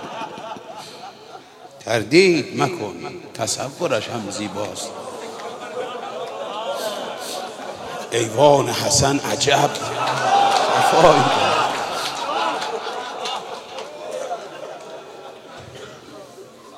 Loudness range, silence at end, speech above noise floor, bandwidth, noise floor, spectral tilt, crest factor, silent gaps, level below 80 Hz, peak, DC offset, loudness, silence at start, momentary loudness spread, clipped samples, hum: 12 LU; 0 s; 23 dB; 16 kHz; -41 dBFS; -3.5 dB/octave; 22 dB; none; -54 dBFS; 0 dBFS; under 0.1%; -20 LUFS; 0 s; 23 LU; under 0.1%; none